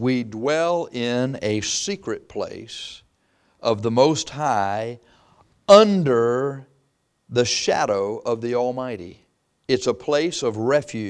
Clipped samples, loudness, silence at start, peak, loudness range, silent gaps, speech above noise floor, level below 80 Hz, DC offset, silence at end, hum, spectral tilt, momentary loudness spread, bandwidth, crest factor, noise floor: under 0.1%; -21 LUFS; 0 s; 0 dBFS; 6 LU; none; 47 dB; -60 dBFS; under 0.1%; 0 s; none; -4.5 dB/octave; 15 LU; 11 kHz; 22 dB; -68 dBFS